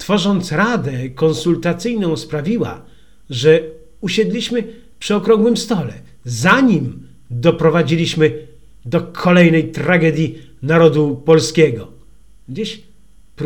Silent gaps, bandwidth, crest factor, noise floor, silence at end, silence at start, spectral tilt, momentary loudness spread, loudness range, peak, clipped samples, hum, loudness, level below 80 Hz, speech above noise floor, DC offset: none; 17 kHz; 16 dB; -50 dBFS; 0 s; 0 s; -6 dB/octave; 16 LU; 4 LU; 0 dBFS; under 0.1%; none; -15 LUFS; -48 dBFS; 35 dB; 0.8%